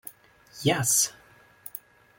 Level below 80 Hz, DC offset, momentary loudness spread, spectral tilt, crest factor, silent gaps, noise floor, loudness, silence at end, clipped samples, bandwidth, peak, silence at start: -66 dBFS; under 0.1%; 22 LU; -2.5 dB/octave; 20 dB; none; -56 dBFS; -24 LUFS; 0.4 s; under 0.1%; 17 kHz; -10 dBFS; 0.05 s